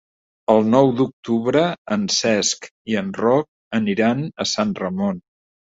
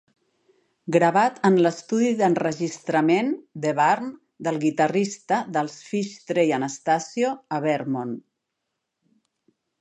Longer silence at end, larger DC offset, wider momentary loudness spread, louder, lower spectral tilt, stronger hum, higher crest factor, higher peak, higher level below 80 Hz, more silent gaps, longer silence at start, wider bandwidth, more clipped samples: second, 0.6 s vs 1.6 s; neither; about the same, 9 LU vs 9 LU; first, -20 LUFS vs -23 LUFS; about the same, -4.5 dB/octave vs -5.5 dB/octave; neither; about the same, 18 dB vs 20 dB; about the same, -2 dBFS vs -4 dBFS; first, -58 dBFS vs -74 dBFS; first, 1.13-1.23 s, 1.78-1.85 s, 2.71-2.85 s, 3.48-3.71 s vs none; second, 0.5 s vs 0.85 s; second, 8 kHz vs 10.5 kHz; neither